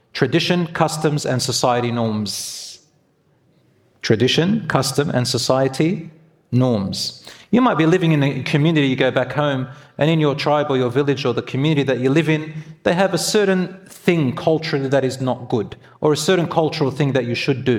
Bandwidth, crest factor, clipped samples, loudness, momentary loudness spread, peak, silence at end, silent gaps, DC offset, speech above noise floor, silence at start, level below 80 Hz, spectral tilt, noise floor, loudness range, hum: 16.5 kHz; 18 dB; under 0.1%; -19 LUFS; 8 LU; 0 dBFS; 0 s; none; under 0.1%; 41 dB; 0.15 s; -56 dBFS; -5.5 dB/octave; -60 dBFS; 3 LU; none